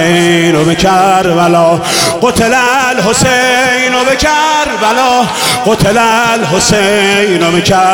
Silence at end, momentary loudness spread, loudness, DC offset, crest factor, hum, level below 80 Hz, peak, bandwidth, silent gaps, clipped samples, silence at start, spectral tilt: 0 s; 2 LU; -8 LUFS; 0.2%; 8 dB; none; -34 dBFS; 0 dBFS; 18.5 kHz; none; under 0.1%; 0 s; -3.5 dB/octave